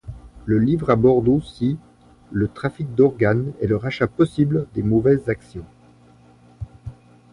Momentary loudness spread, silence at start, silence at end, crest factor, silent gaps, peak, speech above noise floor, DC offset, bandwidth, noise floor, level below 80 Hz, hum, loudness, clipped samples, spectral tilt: 22 LU; 0.05 s; 0.4 s; 16 dB; none; -4 dBFS; 31 dB; under 0.1%; 11 kHz; -51 dBFS; -44 dBFS; none; -20 LUFS; under 0.1%; -9 dB/octave